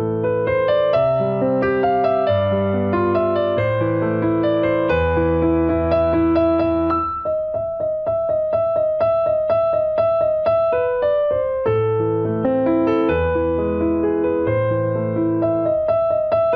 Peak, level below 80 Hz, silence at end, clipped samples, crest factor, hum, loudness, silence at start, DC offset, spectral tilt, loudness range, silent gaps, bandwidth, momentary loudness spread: -6 dBFS; -40 dBFS; 0 s; under 0.1%; 12 dB; none; -19 LUFS; 0 s; under 0.1%; -10.5 dB/octave; 1 LU; none; 5.2 kHz; 3 LU